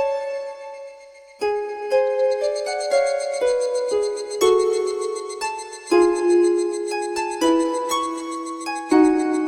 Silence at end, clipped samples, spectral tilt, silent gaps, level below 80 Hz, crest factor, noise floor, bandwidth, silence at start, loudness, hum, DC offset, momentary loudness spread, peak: 0 s; under 0.1%; -2.5 dB/octave; none; -58 dBFS; 16 dB; -44 dBFS; 14.5 kHz; 0 s; -21 LUFS; none; under 0.1%; 11 LU; -4 dBFS